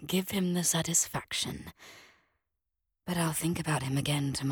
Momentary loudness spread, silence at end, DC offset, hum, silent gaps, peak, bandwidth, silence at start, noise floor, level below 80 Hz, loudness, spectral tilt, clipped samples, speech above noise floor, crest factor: 9 LU; 0 s; under 0.1%; none; none; -14 dBFS; 19 kHz; 0 s; -86 dBFS; -58 dBFS; -30 LUFS; -3.5 dB/octave; under 0.1%; 55 dB; 20 dB